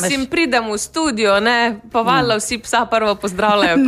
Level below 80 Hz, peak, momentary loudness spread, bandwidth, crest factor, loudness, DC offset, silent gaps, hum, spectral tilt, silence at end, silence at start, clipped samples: -46 dBFS; -4 dBFS; 5 LU; 15.5 kHz; 14 dB; -16 LUFS; under 0.1%; none; none; -3.5 dB/octave; 0 s; 0 s; under 0.1%